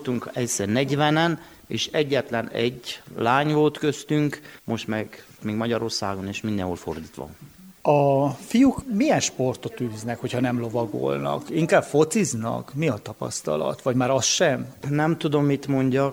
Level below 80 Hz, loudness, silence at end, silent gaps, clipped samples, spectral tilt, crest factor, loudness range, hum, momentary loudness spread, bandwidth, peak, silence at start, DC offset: -58 dBFS; -24 LUFS; 0 s; none; under 0.1%; -5 dB/octave; 18 dB; 4 LU; none; 11 LU; over 20 kHz; -4 dBFS; 0 s; under 0.1%